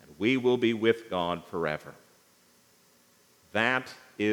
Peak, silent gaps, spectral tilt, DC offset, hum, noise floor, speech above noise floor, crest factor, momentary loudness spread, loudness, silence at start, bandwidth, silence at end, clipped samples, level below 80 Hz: -10 dBFS; none; -5.5 dB/octave; under 0.1%; 60 Hz at -65 dBFS; -63 dBFS; 35 dB; 22 dB; 11 LU; -28 LUFS; 0.1 s; 19.5 kHz; 0 s; under 0.1%; -72 dBFS